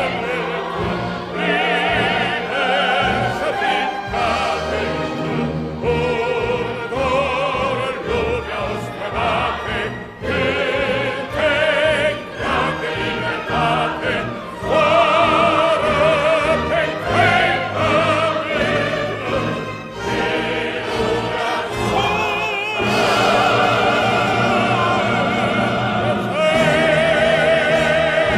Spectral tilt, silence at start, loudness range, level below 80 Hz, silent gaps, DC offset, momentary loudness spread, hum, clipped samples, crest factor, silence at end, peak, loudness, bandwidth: -5 dB/octave; 0 s; 5 LU; -40 dBFS; none; under 0.1%; 8 LU; none; under 0.1%; 14 dB; 0 s; -4 dBFS; -18 LUFS; 14.5 kHz